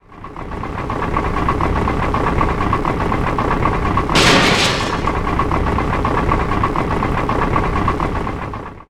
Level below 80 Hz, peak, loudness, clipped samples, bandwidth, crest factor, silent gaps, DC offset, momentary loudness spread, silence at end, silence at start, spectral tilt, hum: -24 dBFS; 0 dBFS; -17 LUFS; under 0.1%; 16 kHz; 16 dB; none; under 0.1%; 11 LU; 0.05 s; 0.1 s; -5 dB/octave; none